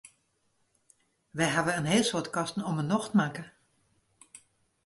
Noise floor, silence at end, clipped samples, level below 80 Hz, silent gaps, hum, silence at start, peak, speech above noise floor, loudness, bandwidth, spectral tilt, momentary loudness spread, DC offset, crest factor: -73 dBFS; 0.5 s; under 0.1%; -68 dBFS; none; none; 1.35 s; -12 dBFS; 45 dB; -29 LUFS; 11.5 kHz; -4.5 dB/octave; 13 LU; under 0.1%; 20 dB